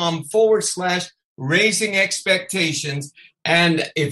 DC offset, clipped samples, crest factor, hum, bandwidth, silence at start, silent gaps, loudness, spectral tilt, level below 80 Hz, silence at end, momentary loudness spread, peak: under 0.1%; under 0.1%; 18 dB; none; 12.5 kHz; 0 s; 1.24-1.36 s; -18 LUFS; -3.5 dB/octave; -64 dBFS; 0 s; 13 LU; -2 dBFS